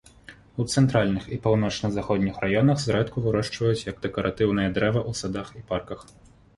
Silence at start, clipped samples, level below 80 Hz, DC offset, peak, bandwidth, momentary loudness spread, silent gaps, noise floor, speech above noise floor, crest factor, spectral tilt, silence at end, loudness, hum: 0.3 s; under 0.1%; -48 dBFS; under 0.1%; -6 dBFS; 11.5 kHz; 10 LU; none; -49 dBFS; 25 dB; 18 dB; -6 dB/octave; 0.55 s; -25 LUFS; none